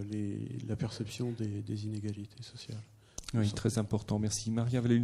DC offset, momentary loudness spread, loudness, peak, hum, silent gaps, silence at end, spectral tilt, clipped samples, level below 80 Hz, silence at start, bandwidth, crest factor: under 0.1%; 14 LU; -35 LUFS; -16 dBFS; none; none; 0 s; -6 dB/octave; under 0.1%; -58 dBFS; 0 s; 13 kHz; 18 dB